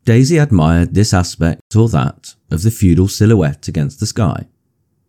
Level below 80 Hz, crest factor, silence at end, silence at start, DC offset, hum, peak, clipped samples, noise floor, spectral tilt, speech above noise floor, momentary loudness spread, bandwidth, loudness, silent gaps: -32 dBFS; 12 dB; 0.65 s; 0.05 s; under 0.1%; none; 0 dBFS; under 0.1%; -64 dBFS; -6.5 dB/octave; 51 dB; 8 LU; 16 kHz; -14 LUFS; 1.61-1.70 s